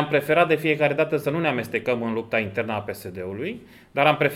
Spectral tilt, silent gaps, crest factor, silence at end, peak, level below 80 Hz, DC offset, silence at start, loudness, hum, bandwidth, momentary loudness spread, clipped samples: -6 dB/octave; none; 20 dB; 0 s; -2 dBFS; -64 dBFS; under 0.1%; 0 s; -23 LUFS; none; 16.5 kHz; 13 LU; under 0.1%